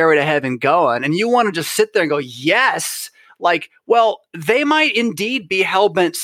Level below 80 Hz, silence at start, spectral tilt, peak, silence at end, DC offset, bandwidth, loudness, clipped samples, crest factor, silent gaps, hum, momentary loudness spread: -68 dBFS; 0 s; -3.5 dB/octave; -2 dBFS; 0 s; under 0.1%; 16.5 kHz; -16 LUFS; under 0.1%; 16 dB; none; none; 7 LU